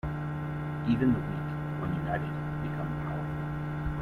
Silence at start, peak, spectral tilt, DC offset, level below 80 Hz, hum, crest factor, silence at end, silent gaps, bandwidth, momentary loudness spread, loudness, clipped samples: 0.05 s; -14 dBFS; -9 dB/octave; under 0.1%; -46 dBFS; none; 18 dB; 0 s; none; 4.6 kHz; 7 LU; -32 LUFS; under 0.1%